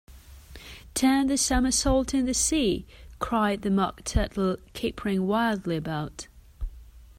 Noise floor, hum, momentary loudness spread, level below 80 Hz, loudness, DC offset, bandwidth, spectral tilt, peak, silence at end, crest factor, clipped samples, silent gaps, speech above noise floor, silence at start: -47 dBFS; none; 19 LU; -38 dBFS; -26 LUFS; under 0.1%; 16 kHz; -4 dB/octave; -10 dBFS; 0.15 s; 16 dB; under 0.1%; none; 22 dB; 0.1 s